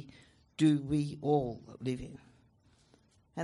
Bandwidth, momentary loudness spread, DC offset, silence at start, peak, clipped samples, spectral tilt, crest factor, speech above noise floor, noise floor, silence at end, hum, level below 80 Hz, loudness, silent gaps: 11.5 kHz; 20 LU; under 0.1%; 0 s; -16 dBFS; under 0.1%; -7.5 dB/octave; 18 dB; 35 dB; -67 dBFS; 0 s; none; -60 dBFS; -33 LUFS; none